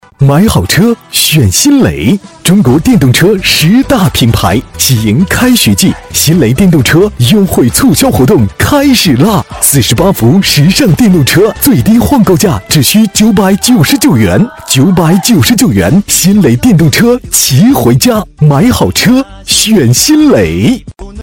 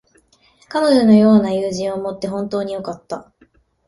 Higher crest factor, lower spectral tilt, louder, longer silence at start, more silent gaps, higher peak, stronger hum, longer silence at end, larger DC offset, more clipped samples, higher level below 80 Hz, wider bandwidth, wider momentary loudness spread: second, 6 dB vs 16 dB; second, -4.5 dB/octave vs -6.5 dB/octave; first, -6 LUFS vs -16 LUFS; second, 0.2 s vs 0.7 s; neither; about the same, 0 dBFS vs -2 dBFS; neither; second, 0 s vs 0.65 s; first, 0.5% vs under 0.1%; first, 0.3% vs under 0.1%; first, -28 dBFS vs -54 dBFS; first, 17.5 kHz vs 11.5 kHz; second, 3 LU vs 18 LU